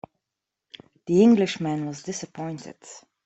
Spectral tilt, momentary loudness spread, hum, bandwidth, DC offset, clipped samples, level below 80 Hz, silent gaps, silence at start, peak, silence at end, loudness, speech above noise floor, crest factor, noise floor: -6 dB/octave; 24 LU; none; 8.2 kHz; under 0.1%; under 0.1%; -68 dBFS; none; 1.05 s; -6 dBFS; 0.25 s; -23 LUFS; 62 dB; 18 dB; -85 dBFS